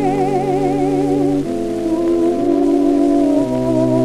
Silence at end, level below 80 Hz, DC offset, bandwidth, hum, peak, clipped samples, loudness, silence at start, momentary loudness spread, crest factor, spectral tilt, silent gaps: 0 s; -40 dBFS; under 0.1%; 12 kHz; none; -4 dBFS; under 0.1%; -16 LUFS; 0 s; 4 LU; 12 dB; -8 dB/octave; none